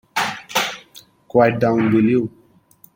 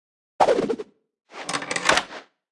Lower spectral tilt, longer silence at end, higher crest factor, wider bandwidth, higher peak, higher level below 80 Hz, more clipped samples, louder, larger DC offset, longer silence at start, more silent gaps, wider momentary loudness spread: first, -5 dB/octave vs -2 dB/octave; first, 0.7 s vs 0.3 s; second, 18 dB vs 24 dB; first, 17 kHz vs 12 kHz; about the same, -2 dBFS vs -2 dBFS; about the same, -58 dBFS vs -58 dBFS; neither; first, -18 LUFS vs -23 LUFS; neither; second, 0.15 s vs 0.4 s; neither; second, 10 LU vs 21 LU